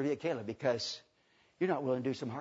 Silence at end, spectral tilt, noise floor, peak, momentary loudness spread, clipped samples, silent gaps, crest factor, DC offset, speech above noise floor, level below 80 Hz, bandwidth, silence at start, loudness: 0 s; -4.5 dB/octave; -70 dBFS; -18 dBFS; 5 LU; under 0.1%; none; 18 dB; under 0.1%; 36 dB; -78 dBFS; 7.6 kHz; 0 s; -35 LUFS